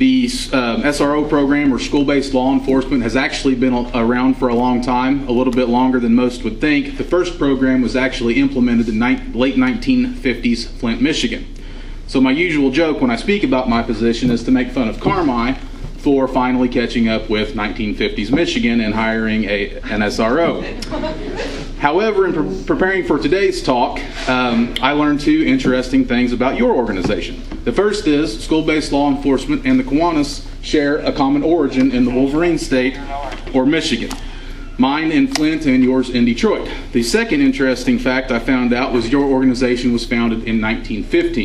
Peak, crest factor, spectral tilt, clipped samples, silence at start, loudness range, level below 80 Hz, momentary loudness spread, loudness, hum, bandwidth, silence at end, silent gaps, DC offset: 0 dBFS; 16 dB; -5.5 dB/octave; under 0.1%; 0 s; 2 LU; -30 dBFS; 6 LU; -16 LUFS; none; 12 kHz; 0 s; none; under 0.1%